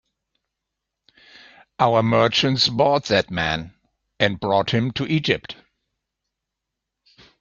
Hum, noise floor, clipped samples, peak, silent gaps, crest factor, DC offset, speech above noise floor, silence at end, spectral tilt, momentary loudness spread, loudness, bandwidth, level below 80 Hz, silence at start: none; -83 dBFS; under 0.1%; -2 dBFS; none; 22 dB; under 0.1%; 63 dB; 1.9 s; -5 dB/octave; 8 LU; -20 LUFS; 7.4 kHz; -54 dBFS; 1.8 s